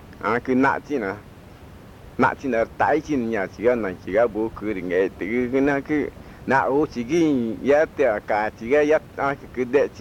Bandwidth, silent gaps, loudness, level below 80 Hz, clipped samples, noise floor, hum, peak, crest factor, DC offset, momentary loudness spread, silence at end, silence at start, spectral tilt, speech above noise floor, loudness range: 16 kHz; none; -22 LUFS; -50 dBFS; under 0.1%; -43 dBFS; none; -6 dBFS; 16 dB; under 0.1%; 7 LU; 0 s; 0 s; -6.5 dB/octave; 22 dB; 2 LU